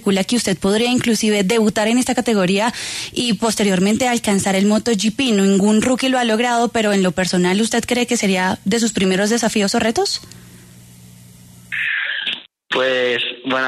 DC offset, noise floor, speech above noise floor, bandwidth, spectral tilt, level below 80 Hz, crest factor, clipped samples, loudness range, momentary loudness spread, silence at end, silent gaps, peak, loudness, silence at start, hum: under 0.1%; -42 dBFS; 26 dB; 13.5 kHz; -4 dB/octave; -50 dBFS; 12 dB; under 0.1%; 5 LU; 5 LU; 0 s; none; -4 dBFS; -17 LUFS; 0 s; none